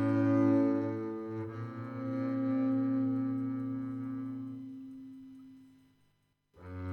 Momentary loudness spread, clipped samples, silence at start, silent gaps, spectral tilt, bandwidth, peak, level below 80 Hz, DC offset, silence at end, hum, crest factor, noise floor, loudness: 20 LU; under 0.1%; 0 s; none; -10 dB/octave; 4.5 kHz; -18 dBFS; -72 dBFS; under 0.1%; 0 s; 50 Hz at -65 dBFS; 16 dB; -74 dBFS; -33 LUFS